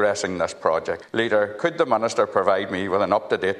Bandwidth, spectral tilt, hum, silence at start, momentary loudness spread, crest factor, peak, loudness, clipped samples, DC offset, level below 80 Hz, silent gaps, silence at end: 11 kHz; -4.5 dB/octave; none; 0 s; 4 LU; 18 dB; -4 dBFS; -22 LUFS; under 0.1%; under 0.1%; -62 dBFS; none; 0 s